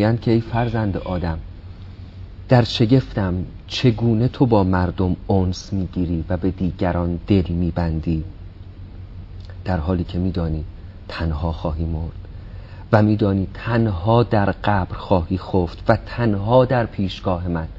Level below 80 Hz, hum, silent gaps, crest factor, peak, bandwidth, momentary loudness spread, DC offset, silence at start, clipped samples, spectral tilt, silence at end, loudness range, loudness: -34 dBFS; none; none; 20 dB; 0 dBFS; 7.6 kHz; 21 LU; under 0.1%; 0 s; under 0.1%; -8 dB/octave; 0 s; 6 LU; -20 LUFS